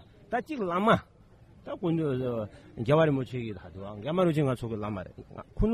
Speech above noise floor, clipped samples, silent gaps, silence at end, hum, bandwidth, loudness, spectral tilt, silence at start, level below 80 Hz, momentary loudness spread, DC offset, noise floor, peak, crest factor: 27 dB; under 0.1%; none; 0 s; none; 13.5 kHz; -29 LUFS; -8 dB/octave; 0.3 s; -46 dBFS; 17 LU; under 0.1%; -56 dBFS; -8 dBFS; 20 dB